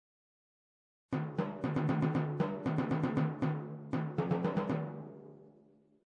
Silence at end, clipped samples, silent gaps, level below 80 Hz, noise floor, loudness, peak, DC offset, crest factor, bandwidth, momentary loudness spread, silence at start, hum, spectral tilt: 0.6 s; under 0.1%; none; -66 dBFS; -65 dBFS; -35 LUFS; -20 dBFS; under 0.1%; 16 dB; 6.8 kHz; 10 LU; 1.1 s; none; -9.5 dB/octave